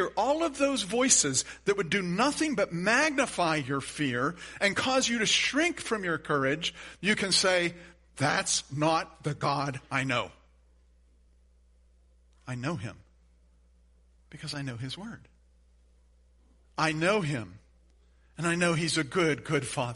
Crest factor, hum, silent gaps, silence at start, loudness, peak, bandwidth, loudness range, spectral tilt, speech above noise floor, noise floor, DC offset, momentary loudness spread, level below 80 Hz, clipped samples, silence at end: 22 dB; none; none; 0 s; -28 LUFS; -8 dBFS; 11.5 kHz; 17 LU; -3 dB/octave; 33 dB; -62 dBFS; under 0.1%; 13 LU; -60 dBFS; under 0.1%; 0 s